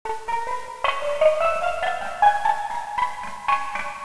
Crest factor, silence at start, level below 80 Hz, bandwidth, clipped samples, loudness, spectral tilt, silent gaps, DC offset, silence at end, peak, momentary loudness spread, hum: 18 dB; 0.05 s; -52 dBFS; 11 kHz; under 0.1%; -23 LUFS; -2 dB/octave; none; 2%; 0 s; -6 dBFS; 9 LU; none